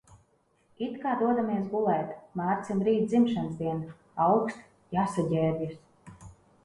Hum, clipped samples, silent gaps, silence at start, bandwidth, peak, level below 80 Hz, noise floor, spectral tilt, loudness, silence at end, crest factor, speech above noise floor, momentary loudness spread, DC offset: none; under 0.1%; none; 0.1 s; 11 kHz; -12 dBFS; -64 dBFS; -68 dBFS; -8 dB/octave; -29 LUFS; 0.3 s; 16 dB; 40 dB; 12 LU; under 0.1%